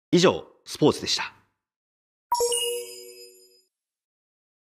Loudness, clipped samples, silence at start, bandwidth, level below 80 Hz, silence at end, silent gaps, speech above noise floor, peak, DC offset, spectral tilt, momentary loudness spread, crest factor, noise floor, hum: -24 LUFS; under 0.1%; 0.1 s; 15.5 kHz; -64 dBFS; 1.35 s; 1.76-2.30 s; 46 dB; -4 dBFS; under 0.1%; -4 dB/octave; 18 LU; 22 dB; -68 dBFS; none